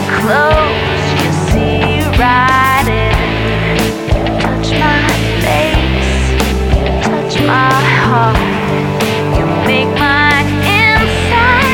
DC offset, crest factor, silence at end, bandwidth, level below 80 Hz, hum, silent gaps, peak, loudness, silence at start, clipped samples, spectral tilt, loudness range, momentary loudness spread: under 0.1%; 12 dB; 0 s; 19.5 kHz; -20 dBFS; none; none; 0 dBFS; -11 LUFS; 0 s; under 0.1%; -5.5 dB/octave; 2 LU; 5 LU